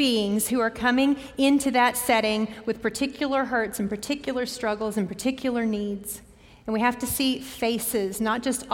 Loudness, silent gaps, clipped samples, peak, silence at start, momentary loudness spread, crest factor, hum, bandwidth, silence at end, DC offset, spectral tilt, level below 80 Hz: -25 LUFS; none; under 0.1%; -8 dBFS; 0 s; 8 LU; 18 dB; none; 17 kHz; 0 s; under 0.1%; -3.5 dB/octave; -54 dBFS